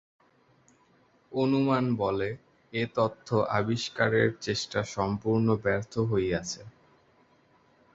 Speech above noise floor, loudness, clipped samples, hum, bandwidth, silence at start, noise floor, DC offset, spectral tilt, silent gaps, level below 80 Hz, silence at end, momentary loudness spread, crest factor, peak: 36 dB; -28 LUFS; under 0.1%; none; 8 kHz; 1.3 s; -64 dBFS; under 0.1%; -6 dB/octave; none; -56 dBFS; 1.25 s; 9 LU; 20 dB; -8 dBFS